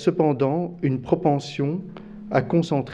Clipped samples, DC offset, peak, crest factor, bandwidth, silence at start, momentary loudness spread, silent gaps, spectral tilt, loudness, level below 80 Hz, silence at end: under 0.1%; under 0.1%; -4 dBFS; 20 dB; 9.2 kHz; 0 s; 9 LU; none; -8 dB/octave; -23 LUFS; -54 dBFS; 0 s